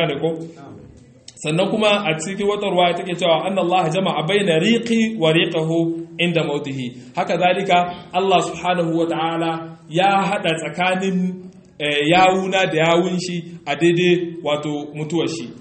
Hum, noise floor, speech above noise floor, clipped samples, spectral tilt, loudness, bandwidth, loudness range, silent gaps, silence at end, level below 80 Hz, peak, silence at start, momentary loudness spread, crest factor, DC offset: none; -44 dBFS; 25 dB; under 0.1%; -5 dB/octave; -19 LUFS; 8.8 kHz; 2 LU; none; 0 s; -60 dBFS; 0 dBFS; 0 s; 9 LU; 18 dB; under 0.1%